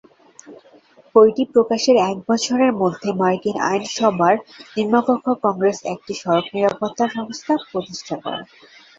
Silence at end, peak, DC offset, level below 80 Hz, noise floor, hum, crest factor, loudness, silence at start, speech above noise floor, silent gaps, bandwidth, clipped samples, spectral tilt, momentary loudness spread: 0.55 s; -2 dBFS; under 0.1%; -64 dBFS; -50 dBFS; none; 18 dB; -19 LUFS; 0.45 s; 32 dB; none; 7.8 kHz; under 0.1%; -5 dB/octave; 12 LU